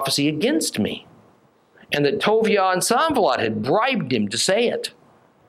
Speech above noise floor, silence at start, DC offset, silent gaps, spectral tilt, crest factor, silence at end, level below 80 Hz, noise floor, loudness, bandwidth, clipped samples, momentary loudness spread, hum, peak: 36 dB; 0 s; under 0.1%; none; -3.5 dB/octave; 16 dB; 0.6 s; -62 dBFS; -56 dBFS; -20 LUFS; 16 kHz; under 0.1%; 8 LU; none; -4 dBFS